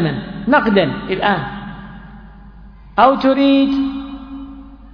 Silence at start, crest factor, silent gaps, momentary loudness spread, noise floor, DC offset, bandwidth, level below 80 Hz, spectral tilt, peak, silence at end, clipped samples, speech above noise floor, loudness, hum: 0 s; 18 dB; none; 20 LU; -39 dBFS; under 0.1%; 5.4 kHz; -40 dBFS; -8.5 dB/octave; 0 dBFS; 0.05 s; under 0.1%; 24 dB; -15 LUFS; none